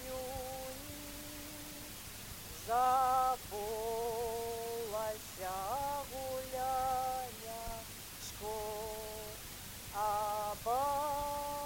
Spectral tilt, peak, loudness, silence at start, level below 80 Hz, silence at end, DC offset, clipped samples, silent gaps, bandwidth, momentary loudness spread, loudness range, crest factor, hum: -3 dB/octave; -20 dBFS; -38 LUFS; 0 s; -56 dBFS; 0 s; under 0.1%; under 0.1%; none; 17 kHz; 12 LU; 5 LU; 18 dB; none